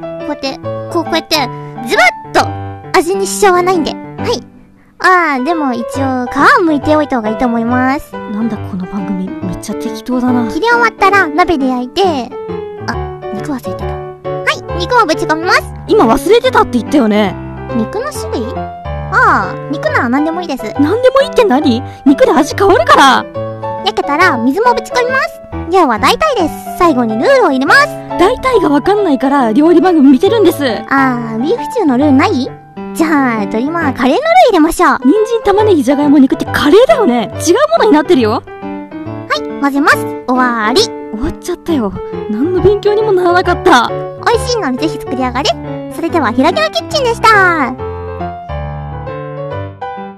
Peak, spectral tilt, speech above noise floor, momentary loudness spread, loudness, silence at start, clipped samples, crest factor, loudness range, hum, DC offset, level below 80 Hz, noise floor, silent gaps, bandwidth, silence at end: 0 dBFS; -5 dB/octave; 30 dB; 14 LU; -11 LUFS; 0 s; 0.2%; 12 dB; 5 LU; none; under 0.1%; -34 dBFS; -41 dBFS; none; 14.5 kHz; 0 s